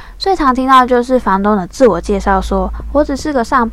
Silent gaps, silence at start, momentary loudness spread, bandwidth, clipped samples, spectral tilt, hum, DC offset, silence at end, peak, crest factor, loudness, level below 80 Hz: none; 0 s; 8 LU; 15 kHz; 0.7%; -5.5 dB/octave; none; under 0.1%; 0 s; 0 dBFS; 12 dB; -13 LUFS; -26 dBFS